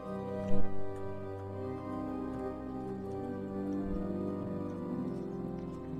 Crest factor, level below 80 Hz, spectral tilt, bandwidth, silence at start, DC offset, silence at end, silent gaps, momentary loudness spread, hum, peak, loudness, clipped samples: 18 dB; -48 dBFS; -9.5 dB/octave; 5.4 kHz; 0 s; under 0.1%; 0 s; none; 5 LU; none; -14 dBFS; -39 LUFS; under 0.1%